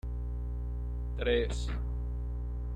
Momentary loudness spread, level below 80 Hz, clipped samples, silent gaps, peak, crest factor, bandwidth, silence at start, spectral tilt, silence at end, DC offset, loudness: 8 LU; -36 dBFS; under 0.1%; none; -18 dBFS; 16 dB; 9 kHz; 0.05 s; -6.5 dB/octave; 0 s; under 0.1%; -35 LUFS